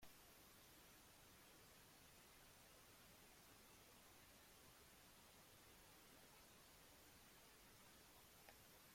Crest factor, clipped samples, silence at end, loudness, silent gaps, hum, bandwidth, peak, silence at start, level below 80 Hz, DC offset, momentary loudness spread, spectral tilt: 20 dB; under 0.1%; 0 s; -66 LUFS; none; none; 16.5 kHz; -48 dBFS; 0 s; -80 dBFS; under 0.1%; 0 LU; -2.5 dB/octave